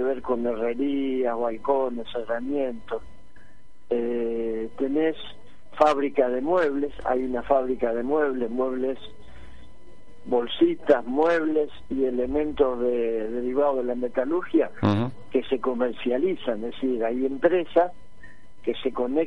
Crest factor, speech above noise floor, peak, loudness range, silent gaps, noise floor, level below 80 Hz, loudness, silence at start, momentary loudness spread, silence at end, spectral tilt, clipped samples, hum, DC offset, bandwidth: 20 dB; 32 dB; -6 dBFS; 5 LU; none; -56 dBFS; -52 dBFS; -25 LUFS; 0 s; 8 LU; 0 s; -7.5 dB/octave; under 0.1%; none; 2%; 9.2 kHz